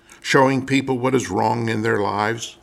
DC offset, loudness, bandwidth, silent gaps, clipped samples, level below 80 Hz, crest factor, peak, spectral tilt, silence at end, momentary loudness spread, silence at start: under 0.1%; -20 LUFS; 14.5 kHz; none; under 0.1%; -58 dBFS; 18 dB; -2 dBFS; -5 dB/octave; 0.1 s; 5 LU; 0.1 s